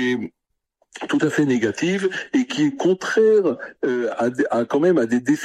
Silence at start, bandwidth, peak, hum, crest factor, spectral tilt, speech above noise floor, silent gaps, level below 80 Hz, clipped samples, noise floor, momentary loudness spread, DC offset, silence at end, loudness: 0 s; 12.5 kHz; -6 dBFS; none; 14 dB; -5.5 dB/octave; 49 dB; none; -66 dBFS; under 0.1%; -69 dBFS; 8 LU; under 0.1%; 0 s; -20 LUFS